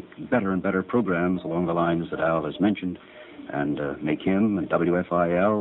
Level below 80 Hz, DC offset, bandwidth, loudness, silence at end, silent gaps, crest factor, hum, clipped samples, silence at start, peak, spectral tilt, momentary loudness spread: -56 dBFS; under 0.1%; 4.1 kHz; -25 LUFS; 0 s; none; 16 dB; none; under 0.1%; 0 s; -8 dBFS; -10 dB/octave; 7 LU